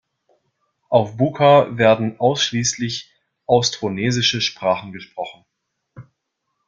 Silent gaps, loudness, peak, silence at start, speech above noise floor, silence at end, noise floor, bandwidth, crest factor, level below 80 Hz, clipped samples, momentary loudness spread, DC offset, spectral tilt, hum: none; -18 LUFS; -2 dBFS; 0.9 s; 58 dB; 0.65 s; -76 dBFS; 7.6 kHz; 18 dB; -58 dBFS; under 0.1%; 17 LU; under 0.1%; -4 dB/octave; none